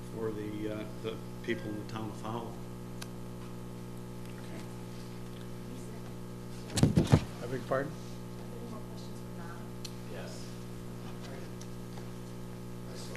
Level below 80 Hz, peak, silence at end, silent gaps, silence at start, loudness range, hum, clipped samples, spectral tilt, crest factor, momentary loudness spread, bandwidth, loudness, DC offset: -52 dBFS; -6 dBFS; 0 s; none; 0 s; 11 LU; 60 Hz at -45 dBFS; under 0.1%; -6 dB/octave; 30 dB; 13 LU; 14.5 kHz; -38 LUFS; under 0.1%